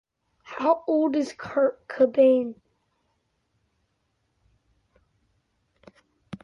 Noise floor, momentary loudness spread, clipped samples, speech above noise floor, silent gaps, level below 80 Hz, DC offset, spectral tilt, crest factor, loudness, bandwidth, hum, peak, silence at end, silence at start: -74 dBFS; 14 LU; under 0.1%; 51 dB; none; -70 dBFS; under 0.1%; -6 dB/octave; 18 dB; -23 LUFS; 7.2 kHz; none; -8 dBFS; 0.05 s; 0.5 s